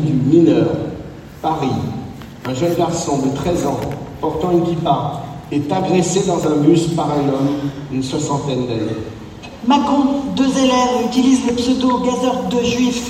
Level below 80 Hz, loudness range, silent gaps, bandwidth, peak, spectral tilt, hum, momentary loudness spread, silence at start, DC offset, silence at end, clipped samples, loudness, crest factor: -42 dBFS; 4 LU; none; 15 kHz; 0 dBFS; -6 dB/octave; none; 12 LU; 0 s; under 0.1%; 0 s; under 0.1%; -17 LUFS; 16 dB